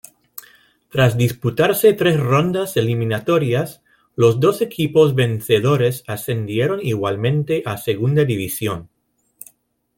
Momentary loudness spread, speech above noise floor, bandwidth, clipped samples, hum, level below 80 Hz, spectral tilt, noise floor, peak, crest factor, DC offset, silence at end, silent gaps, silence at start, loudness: 11 LU; 42 dB; 17 kHz; under 0.1%; none; -54 dBFS; -6 dB/octave; -59 dBFS; -2 dBFS; 16 dB; under 0.1%; 1.1 s; none; 0.95 s; -18 LUFS